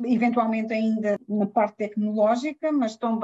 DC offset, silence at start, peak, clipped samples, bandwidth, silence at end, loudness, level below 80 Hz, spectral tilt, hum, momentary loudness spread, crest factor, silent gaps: under 0.1%; 0 s; -10 dBFS; under 0.1%; 7.8 kHz; 0 s; -24 LUFS; -72 dBFS; -7 dB/octave; none; 4 LU; 14 dB; none